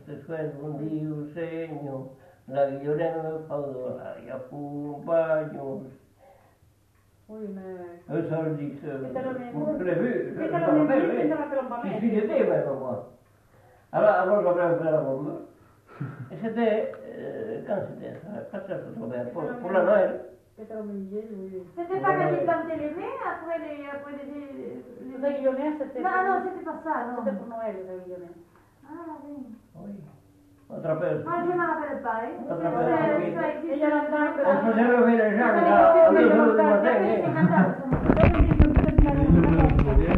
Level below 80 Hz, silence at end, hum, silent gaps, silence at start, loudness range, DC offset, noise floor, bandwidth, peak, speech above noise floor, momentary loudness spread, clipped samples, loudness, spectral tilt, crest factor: -36 dBFS; 0 s; none; none; 0.05 s; 14 LU; under 0.1%; -62 dBFS; 5 kHz; -2 dBFS; 36 dB; 19 LU; under 0.1%; -25 LUFS; -10 dB/octave; 24 dB